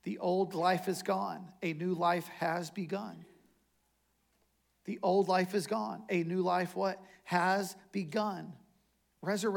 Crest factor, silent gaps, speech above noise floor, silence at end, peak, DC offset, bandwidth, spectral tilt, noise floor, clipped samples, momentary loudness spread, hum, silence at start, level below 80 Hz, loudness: 18 dB; none; 42 dB; 0 s; -16 dBFS; under 0.1%; 18 kHz; -5.5 dB/octave; -76 dBFS; under 0.1%; 11 LU; none; 0.05 s; -82 dBFS; -34 LUFS